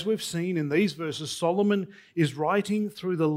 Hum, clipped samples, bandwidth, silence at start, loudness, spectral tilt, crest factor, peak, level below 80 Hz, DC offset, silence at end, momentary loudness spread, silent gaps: none; under 0.1%; 15.5 kHz; 0 s; -27 LUFS; -5.5 dB/octave; 14 dB; -12 dBFS; -70 dBFS; under 0.1%; 0 s; 5 LU; none